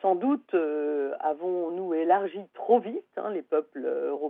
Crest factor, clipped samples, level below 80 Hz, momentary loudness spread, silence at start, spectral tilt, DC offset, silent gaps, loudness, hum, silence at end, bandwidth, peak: 18 dB; under 0.1%; under -90 dBFS; 9 LU; 0.05 s; -9.5 dB/octave; under 0.1%; none; -28 LUFS; none; 0 s; 3.9 kHz; -8 dBFS